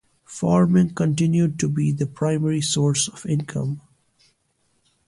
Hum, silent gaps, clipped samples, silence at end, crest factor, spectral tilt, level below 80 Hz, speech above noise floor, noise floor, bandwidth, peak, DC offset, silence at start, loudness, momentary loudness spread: none; none; under 0.1%; 1.3 s; 14 dB; -5.5 dB/octave; -54 dBFS; 47 dB; -68 dBFS; 11.5 kHz; -8 dBFS; under 0.1%; 0.3 s; -21 LUFS; 9 LU